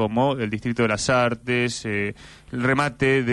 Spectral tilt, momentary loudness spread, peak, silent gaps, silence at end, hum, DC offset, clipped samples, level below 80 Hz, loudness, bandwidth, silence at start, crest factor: -5 dB/octave; 6 LU; -8 dBFS; none; 0 s; none; under 0.1%; under 0.1%; -50 dBFS; -22 LUFS; 11.5 kHz; 0 s; 14 dB